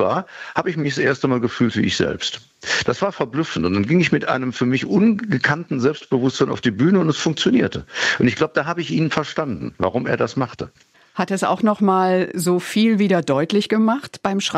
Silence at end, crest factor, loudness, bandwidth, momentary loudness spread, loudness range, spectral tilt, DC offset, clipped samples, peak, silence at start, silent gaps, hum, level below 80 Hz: 0 s; 18 dB; -19 LUFS; 14 kHz; 7 LU; 3 LU; -5.5 dB/octave; under 0.1%; under 0.1%; -2 dBFS; 0 s; none; none; -56 dBFS